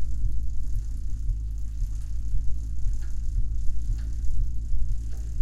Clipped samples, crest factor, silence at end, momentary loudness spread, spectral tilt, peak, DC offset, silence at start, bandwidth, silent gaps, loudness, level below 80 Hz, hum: under 0.1%; 14 dB; 0 s; 2 LU; -6.5 dB/octave; -10 dBFS; under 0.1%; 0 s; 7.6 kHz; none; -33 LUFS; -28 dBFS; none